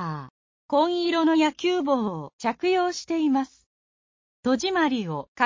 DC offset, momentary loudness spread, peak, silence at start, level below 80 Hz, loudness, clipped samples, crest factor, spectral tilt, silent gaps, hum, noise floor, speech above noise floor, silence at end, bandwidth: under 0.1%; 10 LU; -6 dBFS; 0 s; -66 dBFS; -24 LUFS; under 0.1%; 18 dB; -5 dB/octave; 0.30-0.69 s, 2.33-2.39 s, 3.66-4.43 s, 5.28-5.35 s; none; under -90 dBFS; over 66 dB; 0 s; 7.6 kHz